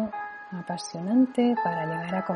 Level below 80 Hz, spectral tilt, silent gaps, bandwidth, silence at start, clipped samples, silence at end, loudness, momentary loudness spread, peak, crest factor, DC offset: -70 dBFS; -6 dB/octave; none; 11 kHz; 0 s; under 0.1%; 0 s; -27 LUFS; 13 LU; -12 dBFS; 16 dB; under 0.1%